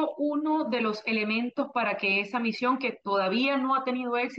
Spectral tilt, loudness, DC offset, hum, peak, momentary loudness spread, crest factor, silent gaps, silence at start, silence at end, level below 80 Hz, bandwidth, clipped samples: -6 dB/octave; -27 LUFS; under 0.1%; none; -14 dBFS; 4 LU; 14 dB; none; 0 s; 0 s; -80 dBFS; 7.6 kHz; under 0.1%